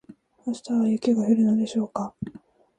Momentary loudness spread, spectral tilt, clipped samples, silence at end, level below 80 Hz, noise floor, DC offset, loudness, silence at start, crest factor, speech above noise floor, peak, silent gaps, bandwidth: 15 LU; -7 dB/octave; under 0.1%; 0.5 s; -62 dBFS; -49 dBFS; under 0.1%; -24 LUFS; 0.1 s; 16 dB; 26 dB; -8 dBFS; none; 9.4 kHz